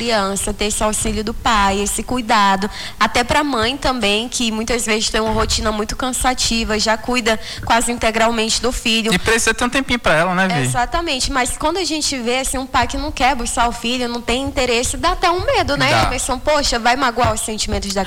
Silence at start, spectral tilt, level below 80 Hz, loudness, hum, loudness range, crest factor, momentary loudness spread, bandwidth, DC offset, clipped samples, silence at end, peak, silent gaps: 0 s; -3 dB/octave; -30 dBFS; -17 LUFS; none; 2 LU; 14 dB; 5 LU; 19 kHz; under 0.1%; under 0.1%; 0 s; -4 dBFS; none